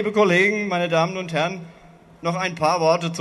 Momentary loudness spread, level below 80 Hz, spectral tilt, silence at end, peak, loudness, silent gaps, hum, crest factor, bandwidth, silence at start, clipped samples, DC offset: 10 LU; -60 dBFS; -5 dB/octave; 0 s; -4 dBFS; -21 LUFS; none; none; 16 dB; 12 kHz; 0 s; under 0.1%; under 0.1%